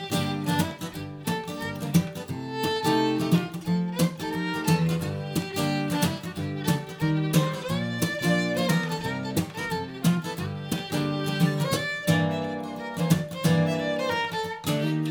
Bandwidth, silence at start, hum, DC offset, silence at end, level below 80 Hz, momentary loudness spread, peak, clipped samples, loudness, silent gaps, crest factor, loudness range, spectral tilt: over 20 kHz; 0 s; none; under 0.1%; 0 s; -58 dBFS; 8 LU; -8 dBFS; under 0.1%; -27 LUFS; none; 18 dB; 2 LU; -5.5 dB/octave